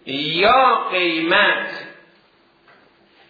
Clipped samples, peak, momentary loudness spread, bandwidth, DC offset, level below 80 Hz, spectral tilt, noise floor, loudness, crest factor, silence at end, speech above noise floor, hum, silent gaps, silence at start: under 0.1%; -2 dBFS; 11 LU; 5 kHz; under 0.1%; -58 dBFS; -5.5 dB/octave; -56 dBFS; -16 LUFS; 16 dB; 1.35 s; 39 dB; none; none; 0.05 s